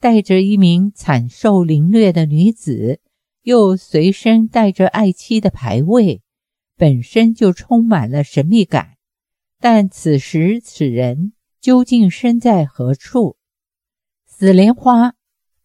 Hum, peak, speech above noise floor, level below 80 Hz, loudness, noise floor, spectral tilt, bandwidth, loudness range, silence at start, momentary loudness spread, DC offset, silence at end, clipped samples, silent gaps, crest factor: none; 0 dBFS; 75 dB; -50 dBFS; -14 LUFS; -87 dBFS; -7.5 dB/octave; 11.5 kHz; 2 LU; 0.05 s; 8 LU; under 0.1%; 0.55 s; under 0.1%; none; 14 dB